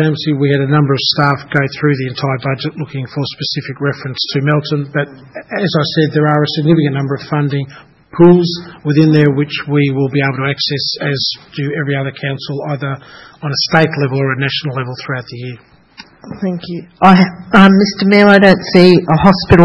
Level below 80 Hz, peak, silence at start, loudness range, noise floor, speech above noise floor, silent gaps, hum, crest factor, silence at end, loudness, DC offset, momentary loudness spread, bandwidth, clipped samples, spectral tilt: -42 dBFS; 0 dBFS; 0 s; 7 LU; -40 dBFS; 27 dB; none; none; 12 dB; 0 s; -13 LUFS; under 0.1%; 14 LU; 7.4 kHz; 0.5%; -7 dB/octave